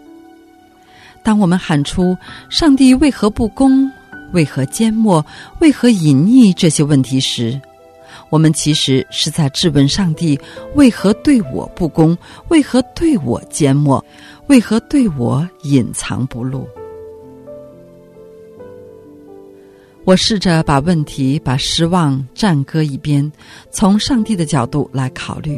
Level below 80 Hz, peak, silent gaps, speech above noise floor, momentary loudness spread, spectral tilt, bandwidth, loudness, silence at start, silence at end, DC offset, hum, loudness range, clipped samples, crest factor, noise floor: -38 dBFS; 0 dBFS; none; 32 dB; 11 LU; -5.5 dB/octave; 13.5 kHz; -14 LUFS; 1.25 s; 0 s; under 0.1%; none; 6 LU; under 0.1%; 14 dB; -45 dBFS